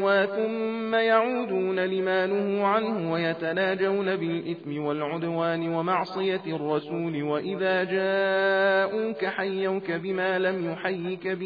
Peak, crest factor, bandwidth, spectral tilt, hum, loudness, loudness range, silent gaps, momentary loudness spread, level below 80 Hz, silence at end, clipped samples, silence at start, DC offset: -8 dBFS; 16 dB; 5 kHz; -8 dB/octave; none; -26 LUFS; 3 LU; none; 7 LU; -76 dBFS; 0 s; under 0.1%; 0 s; under 0.1%